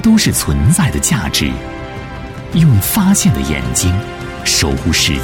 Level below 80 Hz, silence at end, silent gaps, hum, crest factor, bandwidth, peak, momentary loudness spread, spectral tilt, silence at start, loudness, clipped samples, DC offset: -26 dBFS; 0 s; none; none; 12 dB; 18 kHz; -2 dBFS; 15 LU; -4 dB/octave; 0 s; -13 LUFS; under 0.1%; under 0.1%